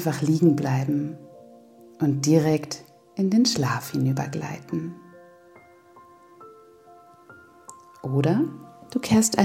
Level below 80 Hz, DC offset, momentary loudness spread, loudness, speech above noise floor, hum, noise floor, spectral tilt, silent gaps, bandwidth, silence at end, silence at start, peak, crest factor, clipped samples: -62 dBFS; under 0.1%; 18 LU; -24 LUFS; 30 dB; none; -52 dBFS; -5.5 dB/octave; none; 16.5 kHz; 0 s; 0 s; -4 dBFS; 22 dB; under 0.1%